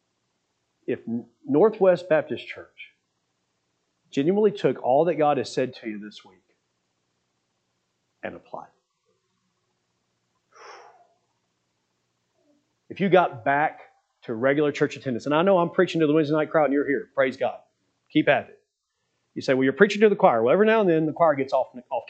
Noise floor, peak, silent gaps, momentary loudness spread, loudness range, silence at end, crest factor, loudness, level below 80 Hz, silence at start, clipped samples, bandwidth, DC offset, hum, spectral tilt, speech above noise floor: -77 dBFS; -2 dBFS; none; 18 LU; 23 LU; 0.05 s; 24 dB; -22 LUFS; -78 dBFS; 0.9 s; under 0.1%; 8.6 kHz; under 0.1%; 60 Hz at -60 dBFS; -6.5 dB/octave; 55 dB